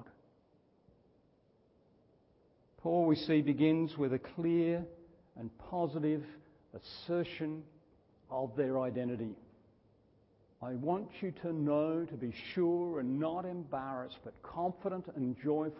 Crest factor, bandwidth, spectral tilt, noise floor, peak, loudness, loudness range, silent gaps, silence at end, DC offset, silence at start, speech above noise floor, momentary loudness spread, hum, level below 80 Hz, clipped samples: 18 dB; 5.6 kHz; -6.5 dB/octave; -70 dBFS; -18 dBFS; -36 LUFS; 7 LU; none; 0 s; under 0.1%; 0 s; 35 dB; 17 LU; none; -70 dBFS; under 0.1%